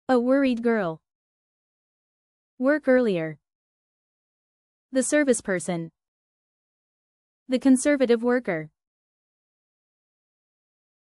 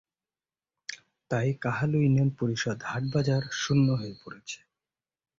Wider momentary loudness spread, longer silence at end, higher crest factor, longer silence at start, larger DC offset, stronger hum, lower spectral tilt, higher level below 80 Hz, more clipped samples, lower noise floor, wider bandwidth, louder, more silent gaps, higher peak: second, 12 LU vs 17 LU; first, 2.4 s vs 0.85 s; about the same, 18 dB vs 16 dB; second, 0.1 s vs 0.9 s; neither; neither; about the same, -5 dB/octave vs -6 dB/octave; second, -66 dBFS vs -60 dBFS; neither; about the same, under -90 dBFS vs under -90 dBFS; first, 12 kHz vs 7.6 kHz; first, -23 LUFS vs -27 LUFS; first, 1.15-2.57 s, 3.55-4.89 s, 6.08-7.46 s vs none; first, -8 dBFS vs -14 dBFS